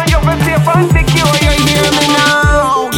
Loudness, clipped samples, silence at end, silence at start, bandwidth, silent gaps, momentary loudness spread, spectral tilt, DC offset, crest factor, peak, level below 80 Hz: -10 LUFS; under 0.1%; 0 s; 0 s; 18 kHz; none; 3 LU; -4.5 dB/octave; under 0.1%; 10 dB; 0 dBFS; -18 dBFS